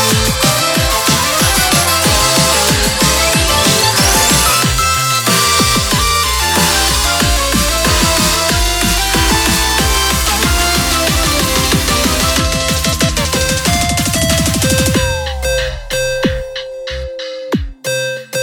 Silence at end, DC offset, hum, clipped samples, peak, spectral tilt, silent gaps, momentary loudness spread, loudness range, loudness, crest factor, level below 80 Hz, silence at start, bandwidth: 0 s; under 0.1%; none; under 0.1%; 0 dBFS; -2.5 dB/octave; none; 8 LU; 5 LU; -11 LUFS; 12 dB; -22 dBFS; 0 s; over 20 kHz